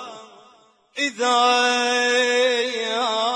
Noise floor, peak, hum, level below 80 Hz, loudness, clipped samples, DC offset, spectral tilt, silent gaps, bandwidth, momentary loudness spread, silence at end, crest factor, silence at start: -55 dBFS; -6 dBFS; none; -80 dBFS; -19 LUFS; under 0.1%; under 0.1%; 0 dB/octave; none; 10.5 kHz; 8 LU; 0 s; 16 dB; 0 s